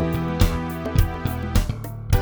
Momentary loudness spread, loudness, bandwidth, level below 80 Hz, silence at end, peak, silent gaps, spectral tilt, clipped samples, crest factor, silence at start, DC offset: 6 LU; -24 LUFS; over 20 kHz; -26 dBFS; 0 s; -4 dBFS; none; -6.5 dB/octave; under 0.1%; 18 dB; 0 s; under 0.1%